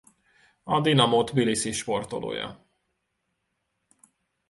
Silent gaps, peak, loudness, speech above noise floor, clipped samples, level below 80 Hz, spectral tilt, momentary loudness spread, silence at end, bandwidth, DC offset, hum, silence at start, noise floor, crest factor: none; -4 dBFS; -25 LUFS; 53 dB; under 0.1%; -60 dBFS; -4.5 dB/octave; 14 LU; 1.95 s; 11.5 kHz; under 0.1%; none; 0.65 s; -78 dBFS; 24 dB